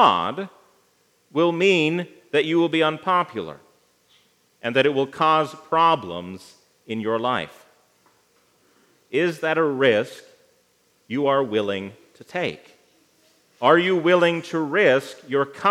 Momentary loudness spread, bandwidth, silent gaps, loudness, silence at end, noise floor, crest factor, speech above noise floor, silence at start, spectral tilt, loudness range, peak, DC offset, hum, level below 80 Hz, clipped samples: 15 LU; 13.5 kHz; none; -21 LUFS; 0 s; -63 dBFS; 20 dB; 42 dB; 0 s; -5.5 dB/octave; 6 LU; -2 dBFS; under 0.1%; 60 Hz at -60 dBFS; -76 dBFS; under 0.1%